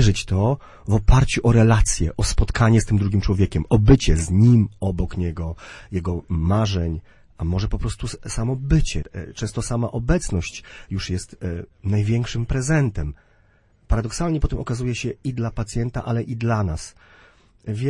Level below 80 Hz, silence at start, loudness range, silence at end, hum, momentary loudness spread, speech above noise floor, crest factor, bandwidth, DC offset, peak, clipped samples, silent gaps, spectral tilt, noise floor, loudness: -28 dBFS; 0 s; 7 LU; 0 s; none; 14 LU; 37 dB; 16 dB; 11.5 kHz; under 0.1%; -4 dBFS; under 0.1%; none; -6 dB/octave; -57 dBFS; -22 LUFS